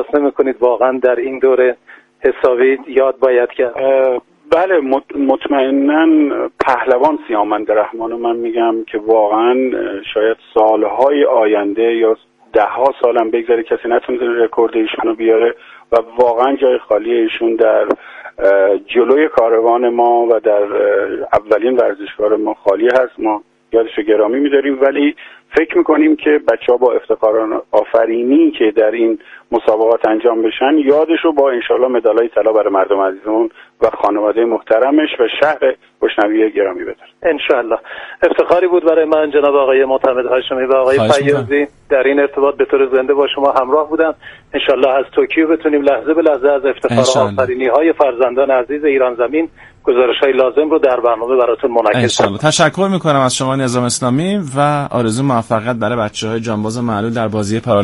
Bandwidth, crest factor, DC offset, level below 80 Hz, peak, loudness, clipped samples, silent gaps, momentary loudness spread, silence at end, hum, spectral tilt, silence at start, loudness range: 11.5 kHz; 14 dB; under 0.1%; -52 dBFS; 0 dBFS; -13 LUFS; under 0.1%; none; 6 LU; 0 s; none; -5.5 dB/octave; 0 s; 2 LU